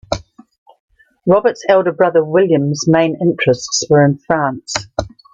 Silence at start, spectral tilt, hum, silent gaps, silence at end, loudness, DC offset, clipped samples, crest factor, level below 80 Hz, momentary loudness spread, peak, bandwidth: 0.1 s; -5 dB/octave; none; 0.58-0.66 s, 0.80-0.88 s; 0.25 s; -15 LUFS; under 0.1%; under 0.1%; 14 dB; -44 dBFS; 10 LU; 0 dBFS; 9.2 kHz